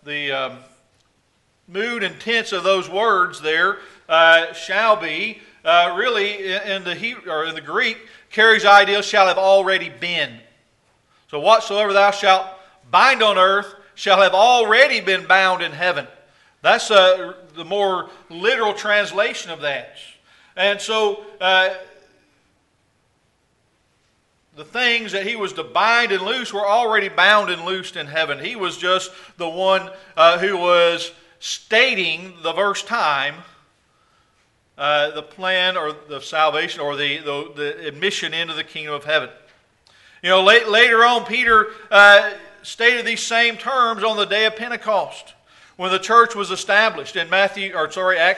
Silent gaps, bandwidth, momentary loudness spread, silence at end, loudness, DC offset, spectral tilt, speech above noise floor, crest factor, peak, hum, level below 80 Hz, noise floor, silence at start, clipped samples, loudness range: none; 11.5 kHz; 14 LU; 0 s; -17 LUFS; under 0.1%; -2 dB/octave; 46 dB; 18 dB; 0 dBFS; none; -64 dBFS; -64 dBFS; 0.05 s; under 0.1%; 8 LU